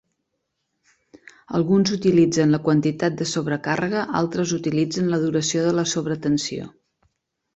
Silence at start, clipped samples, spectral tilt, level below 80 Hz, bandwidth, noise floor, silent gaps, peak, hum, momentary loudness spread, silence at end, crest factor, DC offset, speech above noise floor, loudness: 1.5 s; under 0.1%; -5.5 dB/octave; -58 dBFS; 8.2 kHz; -77 dBFS; none; -6 dBFS; none; 7 LU; 0.85 s; 16 dB; under 0.1%; 56 dB; -21 LUFS